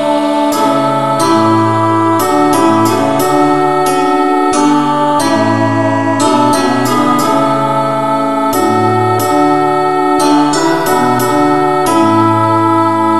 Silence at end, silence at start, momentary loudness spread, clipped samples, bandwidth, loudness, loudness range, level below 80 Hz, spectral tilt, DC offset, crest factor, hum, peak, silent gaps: 0 s; 0 s; 3 LU; under 0.1%; 14.5 kHz; -11 LUFS; 1 LU; -50 dBFS; -5 dB/octave; 3%; 10 dB; none; 0 dBFS; none